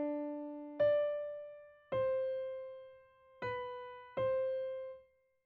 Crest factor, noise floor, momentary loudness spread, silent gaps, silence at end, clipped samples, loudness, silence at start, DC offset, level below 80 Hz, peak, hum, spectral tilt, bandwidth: 16 dB; -64 dBFS; 18 LU; none; 0.45 s; under 0.1%; -38 LUFS; 0 s; under 0.1%; -72 dBFS; -24 dBFS; none; -4.5 dB/octave; 4.6 kHz